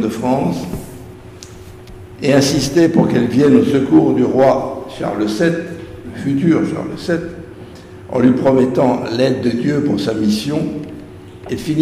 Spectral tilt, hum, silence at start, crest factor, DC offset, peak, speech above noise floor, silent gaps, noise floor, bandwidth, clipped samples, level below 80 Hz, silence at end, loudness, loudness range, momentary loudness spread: -6.5 dB/octave; none; 0 s; 16 dB; under 0.1%; 0 dBFS; 21 dB; none; -35 dBFS; 15.5 kHz; under 0.1%; -44 dBFS; 0 s; -15 LUFS; 5 LU; 23 LU